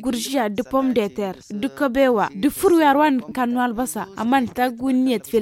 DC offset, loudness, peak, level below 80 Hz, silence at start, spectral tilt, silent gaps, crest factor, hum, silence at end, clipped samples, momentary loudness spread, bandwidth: under 0.1%; -20 LUFS; -4 dBFS; -52 dBFS; 0 s; -4.5 dB/octave; none; 14 dB; none; 0 s; under 0.1%; 10 LU; 17 kHz